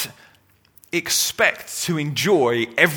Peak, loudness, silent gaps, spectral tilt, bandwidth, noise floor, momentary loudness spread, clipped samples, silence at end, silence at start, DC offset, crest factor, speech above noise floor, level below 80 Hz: 0 dBFS; -20 LUFS; none; -3 dB/octave; over 20 kHz; -57 dBFS; 9 LU; under 0.1%; 0 s; 0 s; under 0.1%; 22 dB; 37 dB; -62 dBFS